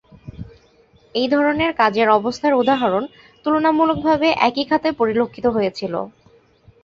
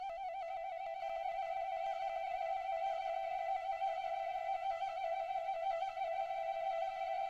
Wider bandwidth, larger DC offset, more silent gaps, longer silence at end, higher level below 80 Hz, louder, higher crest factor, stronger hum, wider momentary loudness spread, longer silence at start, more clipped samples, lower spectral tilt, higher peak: second, 7.6 kHz vs 8.4 kHz; neither; neither; first, 0.75 s vs 0 s; first, -50 dBFS vs -72 dBFS; first, -18 LUFS vs -40 LUFS; first, 18 dB vs 10 dB; neither; first, 12 LU vs 4 LU; first, 0.25 s vs 0 s; neither; first, -6 dB/octave vs -2 dB/octave; first, -2 dBFS vs -28 dBFS